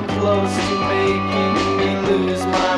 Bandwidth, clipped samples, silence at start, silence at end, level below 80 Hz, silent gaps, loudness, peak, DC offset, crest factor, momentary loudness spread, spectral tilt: 12.5 kHz; under 0.1%; 0 s; 0 s; -44 dBFS; none; -18 LUFS; -4 dBFS; under 0.1%; 14 dB; 1 LU; -5.5 dB/octave